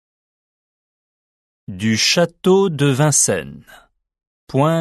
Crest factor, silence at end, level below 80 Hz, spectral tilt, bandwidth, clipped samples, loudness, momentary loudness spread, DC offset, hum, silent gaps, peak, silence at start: 18 dB; 0 s; -56 dBFS; -4 dB/octave; 12.5 kHz; under 0.1%; -16 LUFS; 10 LU; under 0.1%; none; 4.27-4.47 s; -2 dBFS; 1.7 s